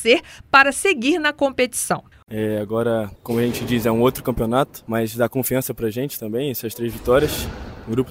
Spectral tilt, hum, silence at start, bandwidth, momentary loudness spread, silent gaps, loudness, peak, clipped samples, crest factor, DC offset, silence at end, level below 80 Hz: -4.5 dB/octave; none; 0 s; 16.5 kHz; 10 LU; 2.23-2.27 s; -20 LUFS; 0 dBFS; under 0.1%; 20 dB; under 0.1%; 0 s; -42 dBFS